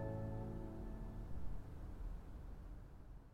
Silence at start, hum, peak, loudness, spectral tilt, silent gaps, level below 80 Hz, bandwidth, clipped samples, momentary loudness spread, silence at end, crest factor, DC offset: 0 s; none; -32 dBFS; -52 LUFS; -9 dB/octave; none; -52 dBFS; 14 kHz; under 0.1%; 11 LU; 0 s; 14 dB; under 0.1%